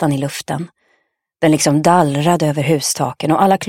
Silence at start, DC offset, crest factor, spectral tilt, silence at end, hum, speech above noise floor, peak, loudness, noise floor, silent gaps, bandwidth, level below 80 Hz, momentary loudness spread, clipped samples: 0 s; under 0.1%; 16 dB; -5 dB/octave; 0 s; none; 49 dB; 0 dBFS; -15 LUFS; -64 dBFS; none; 16.5 kHz; -58 dBFS; 11 LU; under 0.1%